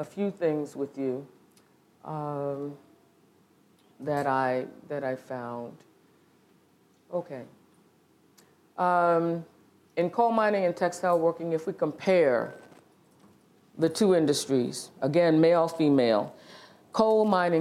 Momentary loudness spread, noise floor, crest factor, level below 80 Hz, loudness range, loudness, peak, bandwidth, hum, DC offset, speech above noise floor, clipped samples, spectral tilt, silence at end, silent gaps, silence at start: 15 LU; -63 dBFS; 20 dB; -76 dBFS; 13 LU; -27 LUFS; -8 dBFS; 15 kHz; none; under 0.1%; 37 dB; under 0.1%; -6 dB/octave; 0 s; none; 0 s